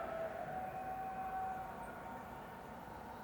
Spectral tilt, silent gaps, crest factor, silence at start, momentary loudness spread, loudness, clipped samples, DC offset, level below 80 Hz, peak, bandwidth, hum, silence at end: -6 dB/octave; none; 12 dB; 0 s; 8 LU; -46 LUFS; under 0.1%; under 0.1%; -64 dBFS; -32 dBFS; over 20 kHz; none; 0 s